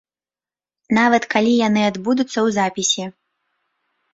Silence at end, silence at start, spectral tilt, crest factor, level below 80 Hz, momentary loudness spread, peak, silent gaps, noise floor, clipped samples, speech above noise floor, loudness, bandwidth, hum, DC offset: 1.05 s; 0.9 s; -3.5 dB/octave; 18 dB; -62 dBFS; 5 LU; -2 dBFS; none; under -90 dBFS; under 0.1%; over 73 dB; -18 LUFS; 8 kHz; none; under 0.1%